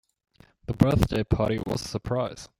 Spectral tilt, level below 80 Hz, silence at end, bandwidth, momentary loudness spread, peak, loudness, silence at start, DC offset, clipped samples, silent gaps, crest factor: -7 dB/octave; -40 dBFS; 0.15 s; 16.5 kHz; 10 LU; -2 dBFS; -26 LUFS; 0.7 s; under 0.1%; under 0.1%; none; 24 dB